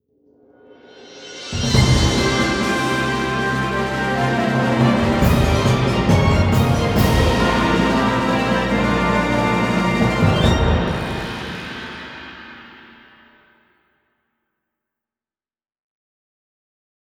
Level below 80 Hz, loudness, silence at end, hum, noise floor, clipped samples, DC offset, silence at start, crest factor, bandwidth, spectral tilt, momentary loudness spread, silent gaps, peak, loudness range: -30 dBFS; -17 LUFS; 4.25 s; none; under -90 dBFS; under 0.1%; under 0.1%; 0.95 s; 18 dB; over 20 kHz; -5.5 dB/octave; 14 LU; none; -2 dBFS; 10 LU